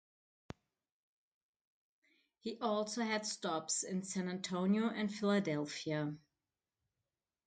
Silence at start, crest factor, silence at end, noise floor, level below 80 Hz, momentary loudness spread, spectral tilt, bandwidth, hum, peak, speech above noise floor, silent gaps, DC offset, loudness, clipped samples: 2.45 s; 18 dB; 1.3 s; under -90 dBFS; -78 dBFS; 17 LU; -4.5 dB/octave; 9.4 kHz; none; -22 dBFS; over 53 dB; none; under 0.1%; -38 LUFS; under 0.1%